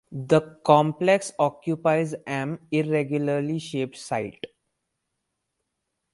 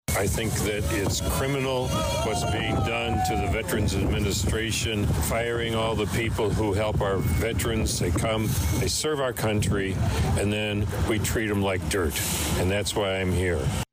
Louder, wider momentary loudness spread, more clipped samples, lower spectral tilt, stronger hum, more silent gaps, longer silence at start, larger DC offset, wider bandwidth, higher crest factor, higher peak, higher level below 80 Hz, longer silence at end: about the same, -24 LUFS vs -25 LUFS; first, 11 LU vs 1 LU; neither; first, -6 dB/octave vs -4.5 dB/octave; neither; neither; about the same, 0.1 s vs 0.1 s; neither; second, 11.5 kHz vs 16 kHz; first, 22 dB vs 8 dB; first, -2 dBFS vs -16 dBFS; second, -66 dBFS vs -34 dBFS; first, 1.65 s vs 0.1 s